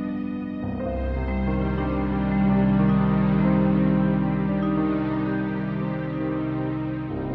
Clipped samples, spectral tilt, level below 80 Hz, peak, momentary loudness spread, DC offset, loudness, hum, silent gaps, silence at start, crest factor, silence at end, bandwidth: under 0.1%; -11 dB/octave; -36 dBFS; -8 dBFS; 9 LU; under 0.1%; -24 LUFS; none; none; 0 s; 14 dB; 0 s; 4.7 kHz